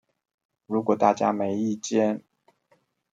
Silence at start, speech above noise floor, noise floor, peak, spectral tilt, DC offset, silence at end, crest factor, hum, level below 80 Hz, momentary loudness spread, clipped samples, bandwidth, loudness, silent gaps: 0.7 s; 44 dB; -67 dBFS; -4 dBFS; -5.5 dB/octave; under 0.1%; 0.95 s; 22 dB; none; -76 dBFS; 7 LU; under 0.1%; 8 kHz; -25 LUFS; none